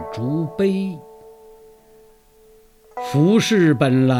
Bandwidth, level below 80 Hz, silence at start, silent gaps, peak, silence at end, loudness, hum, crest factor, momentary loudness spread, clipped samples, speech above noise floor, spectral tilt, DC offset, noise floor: 15.5 kHz; -56 dBFS; 0 s; none; -2 dBFS; 0 s; -18 LUFS; none; 18 dB; 16 LU; under 0.1%; 34 dB; -6.5 dB/octave; under 0.1%; -51 dBFS